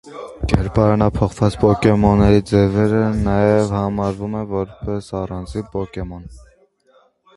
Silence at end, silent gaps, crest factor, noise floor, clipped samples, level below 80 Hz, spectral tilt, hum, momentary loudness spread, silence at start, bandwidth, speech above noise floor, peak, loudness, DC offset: 1 s; none; 18 dB; -56 dBFS; under 0.1%; -32 dBFS; -8 dB/octave; none; 13 LU; 0.05 s; 11.5 kHz; 39 dB; 0 dBFS; -18 LUFS; under 0.1%